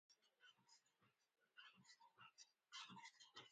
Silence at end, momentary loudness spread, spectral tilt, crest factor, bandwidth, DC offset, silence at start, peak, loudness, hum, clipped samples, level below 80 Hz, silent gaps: 0 s; 10 LU; -1 dB/octave; 22 dB; 9 kHz; under 0.1%; 0.1 s; -46 dBFS; -63 LUFS; none; under 0.1%; under -90 dBFS; none